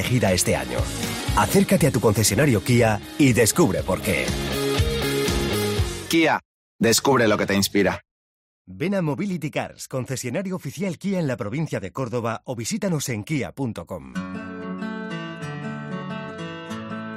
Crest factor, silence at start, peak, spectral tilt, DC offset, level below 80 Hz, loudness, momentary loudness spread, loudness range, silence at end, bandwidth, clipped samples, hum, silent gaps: 16 dB; 0 s; -6 dBFS; -4.5 dB/octave; under 0.1%; -40 dBFS; -23 LUFS; 14 LU; 9 LU; 0 s; 16 kHz; under 0.1%; none; 6.45-6.79 s, 8.11-8.65 s